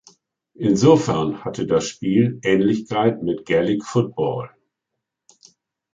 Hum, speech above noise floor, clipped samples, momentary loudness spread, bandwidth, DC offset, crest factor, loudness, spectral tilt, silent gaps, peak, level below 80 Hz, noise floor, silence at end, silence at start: none; 62 dB; under 0.1%; 10 LU; 9.2 kHz; under 0.1%; 18 dB; -20 LUFS; -6.5 dB/octave; none; -2 dBFS; -54 dBFS; -81 dBFS; 1.45 s; 0.6 s